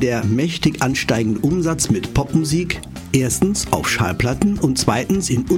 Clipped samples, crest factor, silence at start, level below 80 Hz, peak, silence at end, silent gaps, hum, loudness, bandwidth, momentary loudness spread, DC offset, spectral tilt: under 0.1%; 16 dB; 0 s; -36 dBFS; -2 dBFS; 0 s; none; none; -18 LUFS; 16.5 kHz; 2 LU; under 0.1%; -5 dB/octave